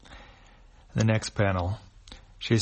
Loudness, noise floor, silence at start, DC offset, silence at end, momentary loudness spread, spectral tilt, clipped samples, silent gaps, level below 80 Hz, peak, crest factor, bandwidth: -28 LUFS; -53 dBFS; 0.1 s; under 0.1%; 0 s; 24 LU; -6 dB/octave; under 0.1%; none; -50 dBFS; -10 dBFS; 20 dB; 8.4 kHz